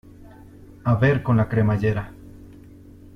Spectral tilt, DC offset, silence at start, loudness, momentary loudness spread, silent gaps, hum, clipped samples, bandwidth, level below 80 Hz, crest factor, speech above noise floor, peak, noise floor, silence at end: -9.5 dB/octave; under 0.1%; 0.05 s; -21 LUFS; 11 LU; none; none; under 0.1%; 6.2 kHz; -46 dBFS; 18 dB; 26 dB; -6 dBFS; -45 dBFS; 0.65 s